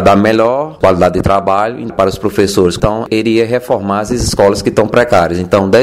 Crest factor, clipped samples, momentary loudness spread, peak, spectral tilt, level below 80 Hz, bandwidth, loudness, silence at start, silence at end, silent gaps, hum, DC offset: 10 dB; 0.6%; 5 LU; 0 dBFS; -5.5 dB/octave; -32 dBFS; 15.5 kHz; -12 LUFS; 0 s; 0 s; none; none; under 0.1%